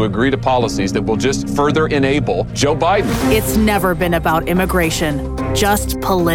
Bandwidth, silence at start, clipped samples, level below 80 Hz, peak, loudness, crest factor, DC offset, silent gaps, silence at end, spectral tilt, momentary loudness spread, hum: 18 kHz; 0 s; under 0.1%; -28 dBFS; -2 dBFS; -16 LUFS; 14 dB; under 0.1%; none; 0 s; -5 dB/octave; 3 LU; none